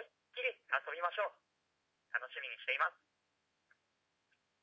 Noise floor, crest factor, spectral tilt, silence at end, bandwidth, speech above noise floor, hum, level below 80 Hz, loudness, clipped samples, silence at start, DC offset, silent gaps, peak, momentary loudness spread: -83 dBFS; 24 dB; 5.5 dB/octave; 1.7 s; 7.6 kHz; 43 dB; none; under -90 dBFS; -39 LUFS; under 0.1%; 0 s; under 0.1%; none; -20 dBFS; 7 LU